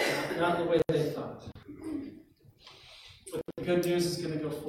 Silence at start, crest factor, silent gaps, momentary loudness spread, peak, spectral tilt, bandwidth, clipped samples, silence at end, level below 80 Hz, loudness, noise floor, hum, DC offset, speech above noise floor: 0 s; 18 dB; none; 21 LU; -14 dBFS; -5.5 dB/octave; 16.5 kHz; under 0.1%; 0 s; -62 dBFS; -31 LUFS; -57 dBFS; none; under 0.1%; 27 dB